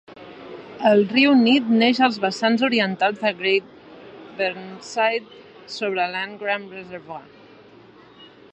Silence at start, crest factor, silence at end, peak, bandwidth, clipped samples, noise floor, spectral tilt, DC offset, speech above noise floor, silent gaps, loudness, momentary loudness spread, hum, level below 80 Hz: 0.1 s; 18 dB; 0.25 s; -4 dBFS; 8.4 kHz; under 0.1%; -48 dBFS; -5 dB/octave; under 0.1%; 27 dB; none; -20 LUFS; 22 LU; none; -70 dBFS